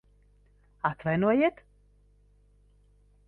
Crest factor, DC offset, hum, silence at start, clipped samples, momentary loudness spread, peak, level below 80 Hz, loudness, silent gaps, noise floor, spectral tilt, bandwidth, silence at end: 20 dB; under 0.1%; 50 Hz at -55 dBFS; 0.85 s; under 0.1%; 9 LU; -12 dBFS; -60 dBFS; -27 LUFS; none; -62 dBFS; -9.5 dB/octave; 4.3 kHz; 1.75 s